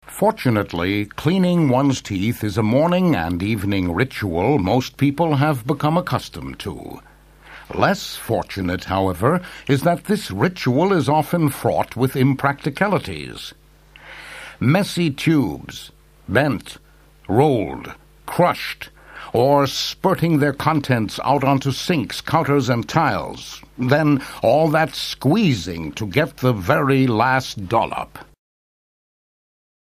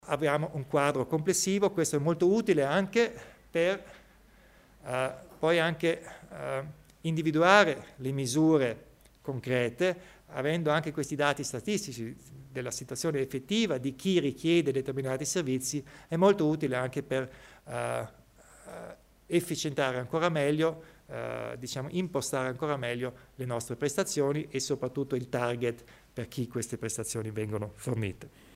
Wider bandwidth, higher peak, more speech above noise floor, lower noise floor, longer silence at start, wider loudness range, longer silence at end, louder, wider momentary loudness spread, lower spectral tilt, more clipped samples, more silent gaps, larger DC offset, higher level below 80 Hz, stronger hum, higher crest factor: about the same, 15.5 kHz vs 16 kHz; first, 0 dBFS vs -6 dBFS; about the same, 28 dB vs 29 dB; second, -47 dBFS vs -58 dBFS; about the same, 0.05 s vs 0.05 s; about the same, 4 LU vs 6 LU; first, 1.7 s vs 0.25 s; first, -19 LUFS vs -30 LUFS; about the same, 14 LU vs 14 LU; first, -6.5 dB/octave vs -5 dB/octave; neither; neither; neither; first, -48 dBFS vs -62 dBFS; neither; about the same, 20 dB vs 24 dB